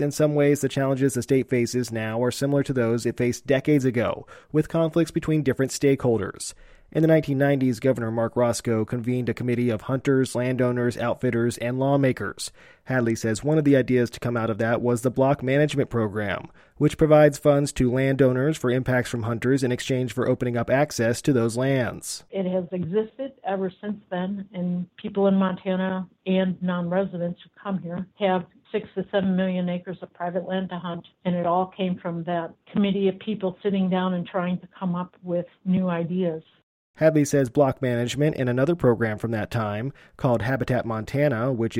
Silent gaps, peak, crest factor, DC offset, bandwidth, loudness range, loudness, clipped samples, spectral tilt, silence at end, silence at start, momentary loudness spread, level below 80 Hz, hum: 36.63-36.94 s; -4 dBFS; 20 dB; under 0.1%; 16 kHz; 6 LU; -24 LUFS; under 0.1%; -6.5 dB/octave; 0 s; 0 s; 10 LU; -52 dBFS; none